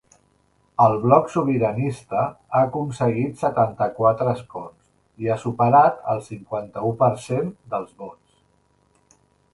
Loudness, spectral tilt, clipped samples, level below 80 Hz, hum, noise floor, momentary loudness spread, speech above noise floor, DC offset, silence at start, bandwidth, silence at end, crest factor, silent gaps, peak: -21 LUFS; -8 dB/octave; under 0.1%; -58 dBFS; none; -63 dBFS; 14 LU; 42 dB; under 0.1%; 0.8 s; 11.5 kHz; 1.4 s; 22 dB; none; 0 dBFS